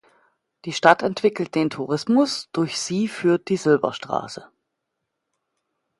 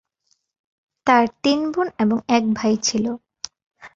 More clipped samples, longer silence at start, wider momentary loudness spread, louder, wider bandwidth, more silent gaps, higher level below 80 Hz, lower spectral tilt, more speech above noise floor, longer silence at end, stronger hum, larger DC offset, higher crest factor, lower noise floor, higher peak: neither; second, 0.65 s vs 1.05 s; second, 11 LU vs 16 LU; about the same, -21 LUFS vs -20 LUFS; first, 11.5 kHz vs 7.8 kHz; second, none vs 3.66-3.70 s; second, -68 dBFS vs -60 dBFS; about the same, -5 dB/octave vs -4 dB/octave; first, 58 dB vs 49 dB; first, 1.55 s vs 0.1 s; neither; neither; about the same, 22 dB vs 20 dB; first, -79 dBFS vs -68 dBFS; about the same, 0 dBFS vs -2 dBFS